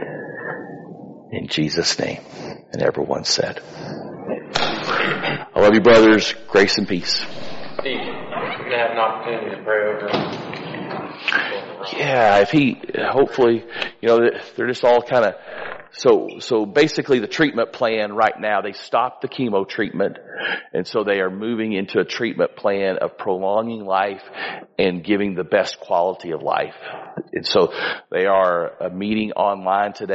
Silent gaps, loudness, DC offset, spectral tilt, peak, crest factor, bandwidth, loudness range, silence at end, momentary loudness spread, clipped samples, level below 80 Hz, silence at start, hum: none; -20 LUFS; under 0.1%; -3 dB/octave; -2 dBFS; 16 dB; 8 kHz; 6 LU; 0 s; 14 LU; under 0.1%; -54 dBFS; 0 s; none